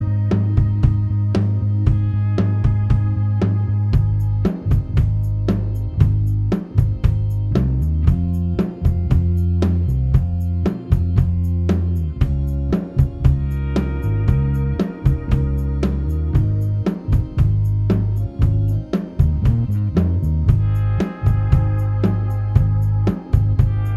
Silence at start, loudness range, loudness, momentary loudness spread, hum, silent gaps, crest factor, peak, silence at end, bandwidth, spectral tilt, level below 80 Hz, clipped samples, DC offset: 0 s; 1 LU; -19 LUFS; 4 LU; none; none; 16 dB; 0 dBFS; 0 s; 5.8 kHz; -10 dB/octave; -24 dBFS; under 0.1%; under 0.1%